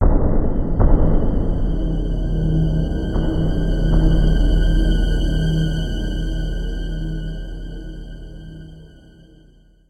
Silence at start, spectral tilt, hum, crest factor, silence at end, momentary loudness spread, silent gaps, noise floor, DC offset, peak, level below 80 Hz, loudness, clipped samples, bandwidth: 0 s; -8 dB/octave; none; 16 dB; 1.05 s; 17 LU; none; -50 dBFS; under 0.1%; -2 dBFS; -20 dBFS; -21 LUFS; under 0.1%; 7.8 kHz